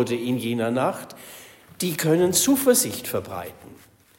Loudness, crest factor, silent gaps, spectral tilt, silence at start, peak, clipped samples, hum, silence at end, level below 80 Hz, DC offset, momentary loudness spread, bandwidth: -22 LUFS; 18 dB; none; -4 dB/octave; 0 s; -6 dBFS; under 0.1%; none; 0.45 s; -62 dBFS; under 0.1%; 21 LU; 16.5 kHz